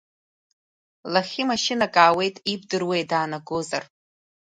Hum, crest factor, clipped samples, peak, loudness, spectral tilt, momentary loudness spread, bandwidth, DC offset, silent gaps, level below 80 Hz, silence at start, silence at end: none; 22 dB; under 0.1%; -2 dBFS; -23 LUFS; -3.5 dB/octave; 12 LU; 11 kHz; under 0.1%; none; -66 dBFS; 1.05 s; 0.7 s